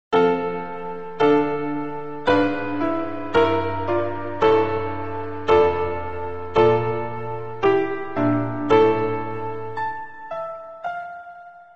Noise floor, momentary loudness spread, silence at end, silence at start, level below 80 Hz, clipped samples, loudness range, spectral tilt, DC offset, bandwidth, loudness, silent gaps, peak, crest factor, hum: -42 dBFS; 13 LU; 0 s; 0.1 s; -52 dBFS; under 0.1%; 2 LU; -7.5 dB/octave; 2%; 7.2 kHz; -22 LUFS; none; -4 dBFS; 18 dB; none